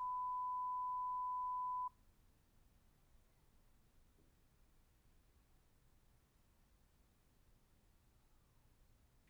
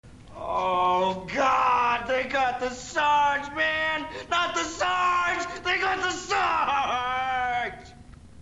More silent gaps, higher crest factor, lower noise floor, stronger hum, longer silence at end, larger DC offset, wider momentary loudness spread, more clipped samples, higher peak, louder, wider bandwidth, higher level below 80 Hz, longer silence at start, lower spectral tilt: neither; about the same, 10 dB vs 14 dB; first, -73 dBFS vs -47 dBFS; neither; first, 7.4 s vs 0 s; neither; second, 2 LU vs 7 LU; neither; second, -38 dBFS vs -12 dBFS; second, -43 LUFS vs -25 LUFS; first, over 20 kHz vs 11.5 kHz; second, -72 dBFS vs -52 dBFS; about the same, 0 s vs 0.05 s; first, -4.5 dB/octave vs -2.5 dB/octave